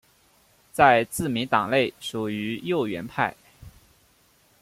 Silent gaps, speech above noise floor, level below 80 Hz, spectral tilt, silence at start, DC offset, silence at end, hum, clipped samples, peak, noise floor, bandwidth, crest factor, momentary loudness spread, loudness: none; 38 dB; -58 dBFS; -4.5 dB/octave; 0.75 s; under 0.1%; 0.95 s; none; under 0.1%; -4 dBFS; -61 dBFS; 16 kHz; 22 dB; 11 LU; -24 LUFS